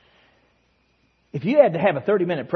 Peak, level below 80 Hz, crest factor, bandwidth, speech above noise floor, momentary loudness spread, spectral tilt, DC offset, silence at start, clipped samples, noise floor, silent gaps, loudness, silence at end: -2 dBFS; -68 dBFS; 20 dB; 5.8 kHz; 45 dB; 11 LU; -9 dB/octave; under 0.1%; 1.35 s; under 0.1%; -64 dBFS; none; -20 LUFS; 0 s